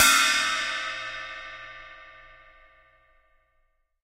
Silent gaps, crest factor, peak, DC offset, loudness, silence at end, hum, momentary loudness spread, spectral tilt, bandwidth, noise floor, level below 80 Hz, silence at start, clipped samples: none; 22 dB; -6 dBFS; under 0.1%; -24 LUFS; 1.85 s; none; 26 LU; 2 dB/octave; 16 kHz; -70 dBFS; -58 dBFS; 0 s; under 0.1%